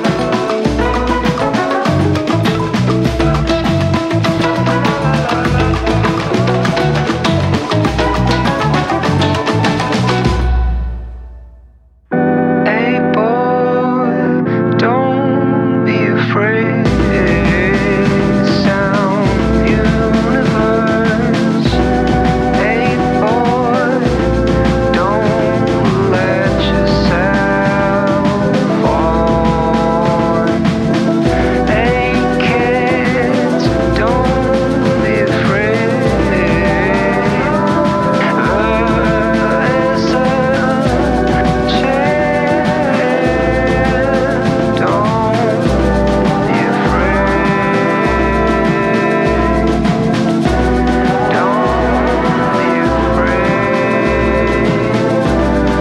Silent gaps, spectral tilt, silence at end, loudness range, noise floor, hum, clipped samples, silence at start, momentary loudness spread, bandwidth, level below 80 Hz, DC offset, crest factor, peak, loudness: none; -7 dB/octave; 0 s; 1 LU; -44 dBFS; none; under 0.1%; 0 s; 2 LU; 12.5 kHz; -24 dBFS; under 0.1%; 10 dB; -2 dBFS; -13 LUFS